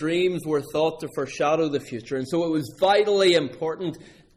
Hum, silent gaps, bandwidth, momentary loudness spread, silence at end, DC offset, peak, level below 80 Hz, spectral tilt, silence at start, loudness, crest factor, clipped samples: none; none; 15.5 kHz; 12 LU; 0.35 s; under 0.1%; -10 dBFS; -60 dBFS; -5 dB/octave; 0 s; -24 LUFS; 14 dB; under 0.1%